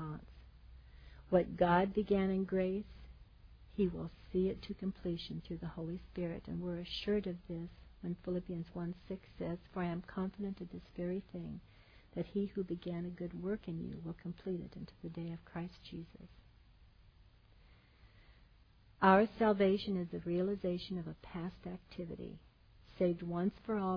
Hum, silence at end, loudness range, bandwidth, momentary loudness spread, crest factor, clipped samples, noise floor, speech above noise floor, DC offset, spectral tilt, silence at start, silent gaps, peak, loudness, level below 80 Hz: none; 0 s; 12 LU; 5.2 kHz; 17 LU; 24 dB; under 0.1%; -65 dBFS; 27 dB; under 0.1%; -6 dB/octave; 0 s; none; -14 dBFS; -38 LUFS; -58 dBFS